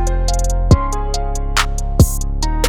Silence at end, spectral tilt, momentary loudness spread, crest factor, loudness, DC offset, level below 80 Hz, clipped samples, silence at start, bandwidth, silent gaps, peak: 0 s; -4.5 dB/octave; 7 LU; 14 dB; -18 LUFS; under 0.1%; -16 dBFS; under 0.1%; 0 s; 17.5 kHz; none; 0 dBFS